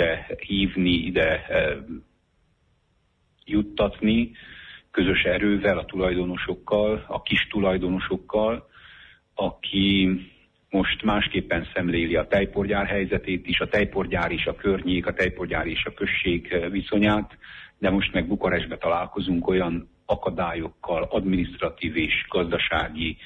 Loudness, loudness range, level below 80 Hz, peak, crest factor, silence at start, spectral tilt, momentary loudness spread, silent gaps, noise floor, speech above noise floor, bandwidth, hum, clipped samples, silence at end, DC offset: -24 LUFS; 2 LU; -42 dBFS; -10 dBFS; 16 dB; 0 s; -7.5 dB/octave; 7 LU; none; -67 dBFS; 43 dB; 6.8 kHz; none; under 0.1%; 0 s; under 0.1%